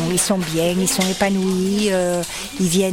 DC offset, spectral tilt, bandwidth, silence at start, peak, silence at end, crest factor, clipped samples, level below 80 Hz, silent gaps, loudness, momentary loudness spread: under 0.1%; -4 dB/octave; 17.5 kHz; 0 s; -4 dBFS; 0 s; 14 dB; under 0.1%; -44 dBFS; none; -19 LUFS; 4 LU